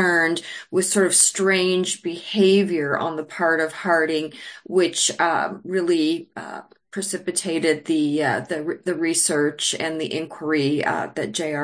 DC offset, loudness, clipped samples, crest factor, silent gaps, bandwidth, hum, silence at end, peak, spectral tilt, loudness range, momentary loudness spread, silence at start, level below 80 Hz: under 0.1%; -21 LUFS; under 0.1%; 20 dB; none; 10.5 kHz; none; 0 s; -2 dBFS; -3 dB/octave; 4 LU; 11 LU; 0 s; -70 dBFS